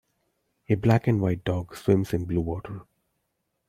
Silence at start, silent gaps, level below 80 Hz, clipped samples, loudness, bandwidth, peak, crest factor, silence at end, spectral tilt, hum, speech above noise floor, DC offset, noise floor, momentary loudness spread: 0.7 s; none; -50 dBFS; under 0.1%; -26 LUFS; 15.5 kHz; -6 dBFS; 20 dB; 0.85 s; -8.5 dB/octave; none; 53 dB; under 0.1%; -78 dBFS; 12 LU